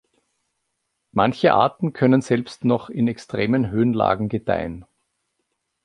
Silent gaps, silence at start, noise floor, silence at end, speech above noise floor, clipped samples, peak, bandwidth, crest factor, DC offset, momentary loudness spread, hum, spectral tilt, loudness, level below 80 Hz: none; 1.15 s; -76 dBFS; 1 s; 56 dB; under 0.1%; -2 dBFS; 10.5 kHz; 20 dB; under 0.1%; 8 LU; none; -7.5 dB/octave; -21 LUFS; -52 dBFS